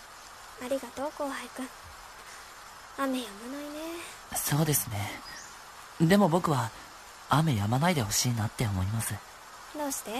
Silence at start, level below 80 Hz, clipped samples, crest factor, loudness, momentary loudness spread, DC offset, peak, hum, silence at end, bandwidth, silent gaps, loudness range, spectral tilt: 0 s; -58 dBFS; under 0.1%; 22 dB; -30 LUFS; 20 LU; under 0.1%; -10 dBFS; none; 0 s; 14 kHz; none; 10 LU; -4.5 dB/octave